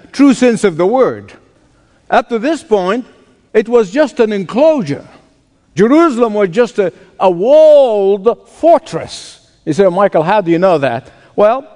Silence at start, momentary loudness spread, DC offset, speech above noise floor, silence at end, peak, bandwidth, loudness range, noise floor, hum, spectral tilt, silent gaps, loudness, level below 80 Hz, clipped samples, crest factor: 0.15 s; 13 LU; under 0.1%; 41 dB; 0.15 s; 0 dBFS; 10.5 kHz; 4 LU; -52 dBFS; none; -6 dB/octave; none; -11 LUFS; -52 dBFS; 0.4%; 12 dB